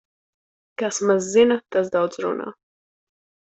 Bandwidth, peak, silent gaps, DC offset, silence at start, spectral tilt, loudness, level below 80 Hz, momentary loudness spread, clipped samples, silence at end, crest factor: 8.2 kHz; -6 dBFS; none; under 0.1%; 0.8 s; -4 dB/octave; -21 LUFS; -66 dBFS; 13 LU; under 0.1%; 1 s; 18 dB